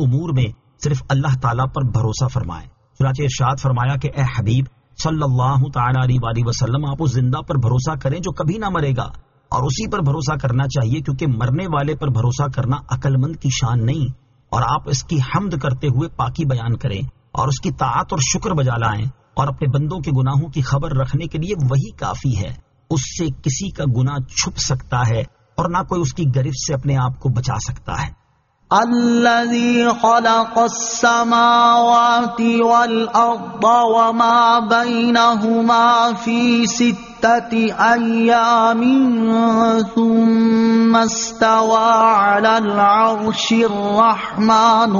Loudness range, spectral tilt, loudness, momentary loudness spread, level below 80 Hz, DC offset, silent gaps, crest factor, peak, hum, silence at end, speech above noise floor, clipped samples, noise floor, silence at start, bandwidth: 7 LU; -5.5 dB/octave; -17 LUFS; 9 LU; -40 dBFS; under 0.1%; none; 14 dB; -2 dBFS; none; 0 s; 42 dB; under 0.1%; -58 dBFS; 0 s; 7.4 kHz